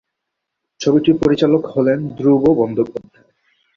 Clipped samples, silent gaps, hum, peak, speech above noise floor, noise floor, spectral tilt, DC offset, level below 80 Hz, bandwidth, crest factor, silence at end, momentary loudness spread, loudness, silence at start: under 0.1%; none; none; -2 dBFS; 63 dB; -78 dBFS; -7.5 dB/octave; under 0.1%; -50 dBFS; 7.4 kHz; 16 dB; 0.75 s; 8 LU; -16 LUFS; 0.8 s